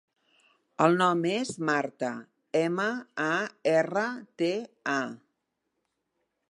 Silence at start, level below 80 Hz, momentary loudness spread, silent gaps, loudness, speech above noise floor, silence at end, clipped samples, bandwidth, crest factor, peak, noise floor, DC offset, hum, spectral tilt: 0.8 s; -80 dBFS; 10 LU; none; -28 LUFS; 53 dB; 1.35 s; under 0.1%; 11.5 kHz; 24 dB; -6 dBFS; -81 dBFS; under 0.1%; none; -5 dB/octave